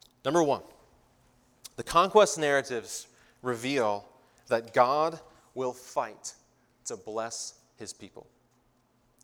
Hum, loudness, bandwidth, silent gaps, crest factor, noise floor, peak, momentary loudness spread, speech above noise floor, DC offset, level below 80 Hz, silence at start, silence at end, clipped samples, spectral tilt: none; -28 LUFS; 18 kHz; none; 24 dB; -68 dBFS; -6 dBFS; 21 LU; 40 dB; under 0.1%; -64 dBFS; 0.25 s; 1.05 s; under 0.1%; -3.5 dB/octave